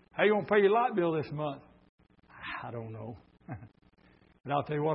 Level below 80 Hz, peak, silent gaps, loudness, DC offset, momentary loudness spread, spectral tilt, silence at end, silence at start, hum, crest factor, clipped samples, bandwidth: -68 dBFS; -12 dBFS; 1.89-1.98 s; -30 LUFS; under 0.1%; 21 LU; -10 dB/octave; 0 s; 0.15 s; none; 20 dB; under 0.1%; 5.6 kHz